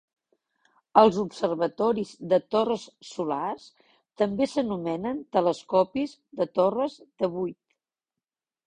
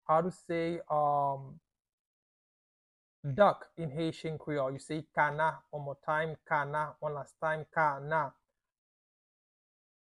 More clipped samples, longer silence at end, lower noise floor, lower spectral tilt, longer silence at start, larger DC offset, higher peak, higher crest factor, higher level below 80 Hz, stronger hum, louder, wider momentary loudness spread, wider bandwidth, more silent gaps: neither; second, 1.15 s vs 1.8 s; about the same, -90 dBFS vs under -90 dBFS; about the same, -6.5 dB/octave vs -6.5 dB/octave; first, 0.95 s vs 0.1 s; neither; first, -4 dBFS vs -12 dBFS; about the same, 24 dB vs 22 dB; about the same, -66 dBFS vs -70 dBFS; neither; first, -26 LUFS vs -33 LUFS; about the same, 11 LU vs 12 LU; second, 10 kHz vs 11.5 kHz; second, none vs 1.93-3.23 s